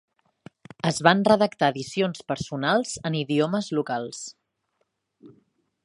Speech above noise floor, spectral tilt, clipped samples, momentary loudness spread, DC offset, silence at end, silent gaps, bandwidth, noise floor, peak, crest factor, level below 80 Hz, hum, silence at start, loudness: 51 dB; -5 dB/octave; under 0.1%; 11 LU; under 0.1%; 0.55 s; none; 11.5 kHz; -75 dBFS; -2 dBFS; 24 dB; -64 dBFS; none; 0.85 s; -24 LUFS